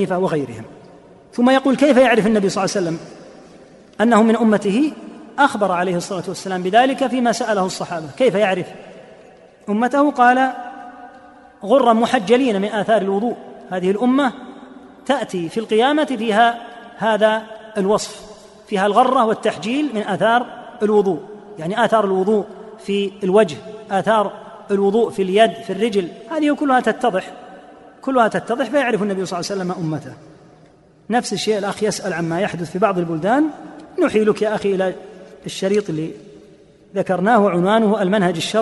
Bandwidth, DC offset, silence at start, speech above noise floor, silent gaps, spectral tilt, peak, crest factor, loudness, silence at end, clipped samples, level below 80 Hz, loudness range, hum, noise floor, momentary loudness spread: 11.5 kHz; under 0.1%; 0 s; 32 dB; none; -5.5 dB/octave; -2 dBFS; 18 dB; -18 LUFS; 0 s; under 0.1%; -60 dBFS; 4 LU; none; -49 dBFS; 16 LU